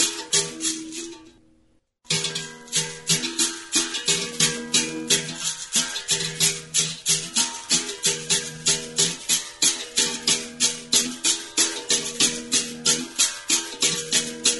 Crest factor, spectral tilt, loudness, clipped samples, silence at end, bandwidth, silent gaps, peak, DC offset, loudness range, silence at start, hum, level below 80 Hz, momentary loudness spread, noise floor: 22 dB; -0.5 dB/octave; -21 LUFS; under 0.1%; 0 s; 12 kHz; none; -4 dBFS; under 0.1%; 4 LU; 0 s; none; -60 dBFS; 5 LU; -63 dBFS